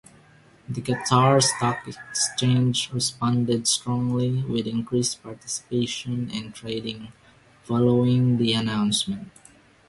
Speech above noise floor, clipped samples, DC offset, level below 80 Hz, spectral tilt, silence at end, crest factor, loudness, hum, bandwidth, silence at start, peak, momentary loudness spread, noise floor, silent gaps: 31 dB; under 0.1%; under 0.1%; -56 dBFS; -4.5 dB/octave; 0.6 s; 20 dB; -23 LUFS; none; 11.5 kHz; 0.7 s; -4 dBFS; 12 LU; -54 dBFS; none